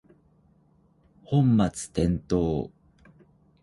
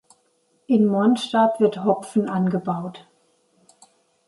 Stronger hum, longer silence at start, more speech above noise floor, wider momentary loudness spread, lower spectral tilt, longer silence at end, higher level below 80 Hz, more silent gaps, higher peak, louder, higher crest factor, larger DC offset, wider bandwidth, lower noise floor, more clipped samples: neither; first, 1.3 s vs 0.7 s; second, 38 dB vs 45 dB; about the same, 8 LU vs 9 LU; about the same, -7.5 dB/octave vs -7 dB/octave; second, 0.95 s vs 1.3 s; first, -46 dBFS vs -70 dBFS; neither; about the same, -8 dBFS vs -6 dBFS; second, -25 LUFS vs -21 LUFS; about the same, 18 dB vs 16 dB; neither; about the same, 11.5 kHz vs 11.5 kHz; about the same, -62 dBFS vs -65 dBFS; neither